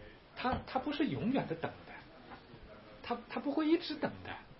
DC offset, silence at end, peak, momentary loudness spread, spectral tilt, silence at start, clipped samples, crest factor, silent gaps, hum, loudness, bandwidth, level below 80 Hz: under 0.1%; 0 s; -20 dBFS; 20 LU; -4.5 dB/octave; 0 s; under 0.1%; 18 dB; none; none; -37 LUFS; 5.8 kHz; -62 dBFS